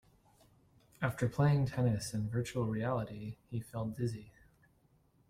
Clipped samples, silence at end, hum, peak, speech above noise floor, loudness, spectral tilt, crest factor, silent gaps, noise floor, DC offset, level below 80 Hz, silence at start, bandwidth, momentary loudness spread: under 0.1%; 1 s; none; -18 dBFS; 36 dB; -36 LUFS; -7 dB/octave; 18 dB; none; -70 dBFS; under 0.1%; -62 dBFS; 1 s; 15 kHz; 13 LU